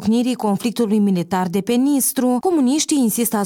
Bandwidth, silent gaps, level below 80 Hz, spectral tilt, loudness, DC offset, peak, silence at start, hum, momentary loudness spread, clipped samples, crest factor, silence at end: 18 kHz; none; -60 dBFS; -5 dB/octave; -18 LUFS; under 0.1%; -6 dBFS; 0 s; none; 3 LU; under 0.1%; 12 dB; 0 s